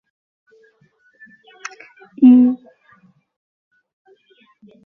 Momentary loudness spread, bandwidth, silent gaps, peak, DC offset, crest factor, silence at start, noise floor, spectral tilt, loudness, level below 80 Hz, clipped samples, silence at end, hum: 25 LU; 6.8 kHz; none; -2 dBFS; under 0.1%; 18 dB; 2.2 s; -58 dBFS; -6 dB/octave; -13 LUFS; -72 dBFS; under 0.1%; 2.3 s; none